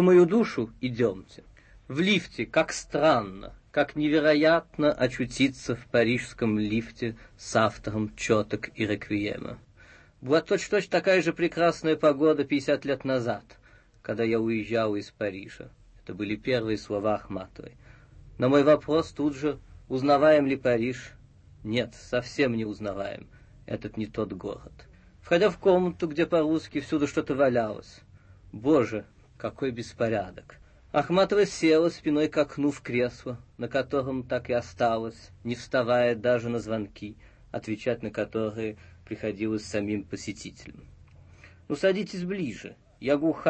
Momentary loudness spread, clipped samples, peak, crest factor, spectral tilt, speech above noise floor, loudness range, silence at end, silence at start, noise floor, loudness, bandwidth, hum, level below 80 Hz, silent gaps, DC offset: 16 LU; under 0.1%; -8 dBFS; 18 dB; -6 dB/octave; 28 dB; 7 LU; 0 s; 0 s; -54 dBFS; -27 LUFS; 8.8 kHz; none; -56 dBFS; none; under 0.1%